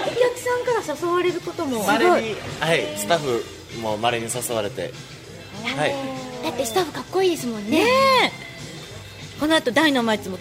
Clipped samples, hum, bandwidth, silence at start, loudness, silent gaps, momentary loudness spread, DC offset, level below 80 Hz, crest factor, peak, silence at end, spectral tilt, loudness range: under 0.1%; none; 16 kHz; 0 s; -22 LUFS; none; 17 LU; under 0.1%; -54 dBFS; 18 dB; -4 dBFS; 0 s; -3.5 dB/octave; 5 LU